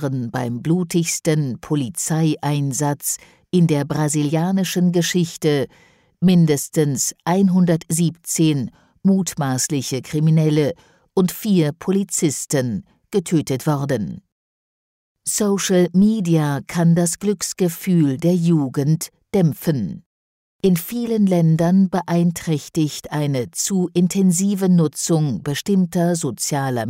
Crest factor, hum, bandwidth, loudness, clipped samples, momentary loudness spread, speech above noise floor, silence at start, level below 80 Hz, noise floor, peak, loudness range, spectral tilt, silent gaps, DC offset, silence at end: 12 dB; none; 16 kHz; -19 LUFS; under 0.1%; 7 LU; over 72 dB; 0 s; -56 dBFS; under -90 dBFS; -6 dBFS; 3 LU; -5.5 dB/octave; 14.32-15.15 s, 20.06-20.59 s; under 0.1%; 0 s